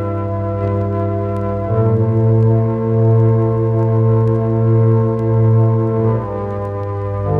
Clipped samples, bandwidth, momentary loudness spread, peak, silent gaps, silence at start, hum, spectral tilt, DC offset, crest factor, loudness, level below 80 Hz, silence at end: under 0.1%; 2.8 kHz; 8 LU; -2 dBFS; none; 0 s; none; -12 dB/octave; under 0.1%; 12 dB; -16 LUFS; -38 dBFS; 0 s